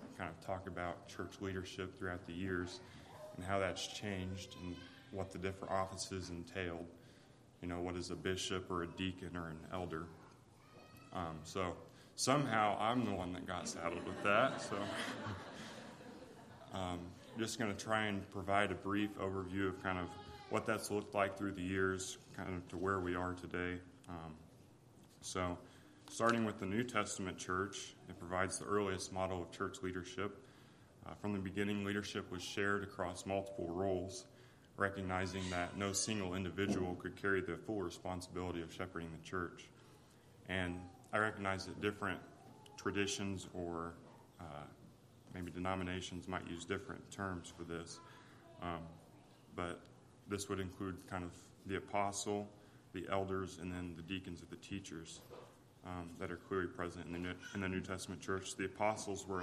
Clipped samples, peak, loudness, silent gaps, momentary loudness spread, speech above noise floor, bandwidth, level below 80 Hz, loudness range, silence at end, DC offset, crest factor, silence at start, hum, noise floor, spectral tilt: under 0.1%; -18 dBFS; -42 LUFS; none; 15 LU; 22 dB; 14.5 kHz; -72 dBFS; 7 LU; 0 s; under 0.1%; 26 dB; 0 s; none; -63 dBFS; -4.5 dB/octave